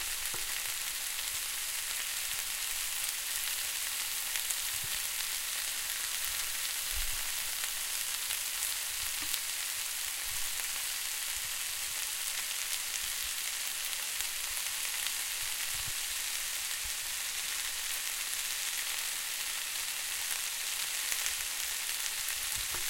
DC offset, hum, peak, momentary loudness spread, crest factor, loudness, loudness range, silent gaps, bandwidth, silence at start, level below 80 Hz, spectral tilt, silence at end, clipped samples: under 0.1%; none; -10 dBFS; 1 LU; 26 dB; -33 LUFS; 1 LU; none; 17 kHz; 0 s; -56 dBFS; 2.5 dB/octave; 0 s; under 0.1%